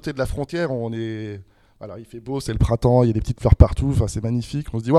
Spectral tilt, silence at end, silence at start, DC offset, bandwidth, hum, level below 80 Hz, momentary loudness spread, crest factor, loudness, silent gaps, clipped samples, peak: -7.5 dB/octave; 0 s; 0.05 s; under 0.1%; 12.5 kHz; none; -26 dBFS; 20 LU; 20 dB; -21 LUFS; none; under 0.1%; 0 dBFS